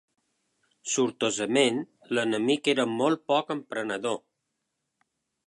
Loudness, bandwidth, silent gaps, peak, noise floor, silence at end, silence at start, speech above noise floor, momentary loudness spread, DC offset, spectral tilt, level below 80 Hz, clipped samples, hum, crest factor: -27 LUFS; 11.5 kHz; none; -10 dBFS; -81 dBFS; 1.3 s; 0.85 s; 55 dB; 9 LU; under 0.1%; -3.5 dB/octave; -78 dBFS; under 0.1%; none; 20 dB